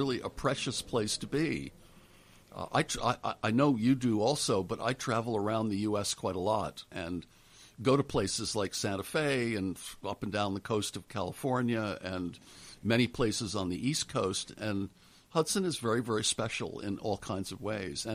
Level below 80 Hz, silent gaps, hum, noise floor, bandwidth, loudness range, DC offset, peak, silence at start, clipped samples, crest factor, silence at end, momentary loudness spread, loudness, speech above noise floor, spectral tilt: -58 dBFS; none; none; -59 dBFS; 15.5 kHz; 3 LU; under 0.1%; -14 dBFS; 0 s; under 0.1%; 20 dB; 0 s; 10 LU; -32 LUFS; 26 dB; -4.5 dB/octave